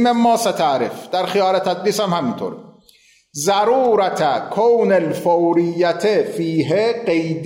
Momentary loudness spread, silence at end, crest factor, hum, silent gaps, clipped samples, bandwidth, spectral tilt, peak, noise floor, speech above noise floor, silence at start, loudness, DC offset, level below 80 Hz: 7 LU; 0 s; 12 dB; none; none; under 0.1%; 16 kHz; -5 dB/octave; -6 dBFS; -53 dBFS; 36 dB; 0 s; -17 LUFS; under 0.1%; -66 dBFS